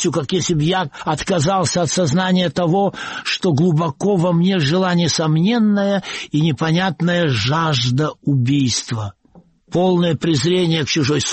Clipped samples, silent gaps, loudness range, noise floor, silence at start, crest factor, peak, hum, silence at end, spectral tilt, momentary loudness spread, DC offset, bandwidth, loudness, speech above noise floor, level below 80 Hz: under 0.1%; none; 2 LU; -50 dBFS; 0 s; 10 dB; -6 dBFS; none; 0 s; -5 dB/octave; 5 LU; under 0.1%; 8.8 kHz; -17 LUFS; 33 dB; -50 dBFS